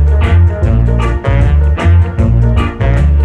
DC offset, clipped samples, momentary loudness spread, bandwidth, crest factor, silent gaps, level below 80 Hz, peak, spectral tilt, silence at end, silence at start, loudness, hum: under 0.1%; under 0.1%; 3 LU; 8 kHz; 8 dB; none; -12 dBFS; 0 dBFS; -8.5 dB/octave; 0 s; 0 s; -11 LUFS; none